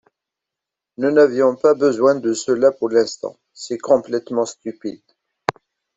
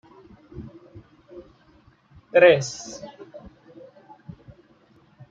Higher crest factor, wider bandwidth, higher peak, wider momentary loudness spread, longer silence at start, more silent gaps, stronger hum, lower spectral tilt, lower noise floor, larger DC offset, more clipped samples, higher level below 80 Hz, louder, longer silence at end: about the same, 20 dB vs 24 dB; about the same, 8.2 kHz vs 7.8 kHz; about the same, 0 dBFS vs -2 dBFS; second, 15 LU vs 30 LU; first, 1 s vs 0.55 s; neither; neither; about the same, -4.5 dB/octave vs -4.5 dB/octave; first, -85 dBFS vs -57 dBFS; neither; neither; second, -66 dBFS vs -60 dBFS; about the same, -18 LUFS vs -19 LUFS; second, 0.45 s vs 2.25 s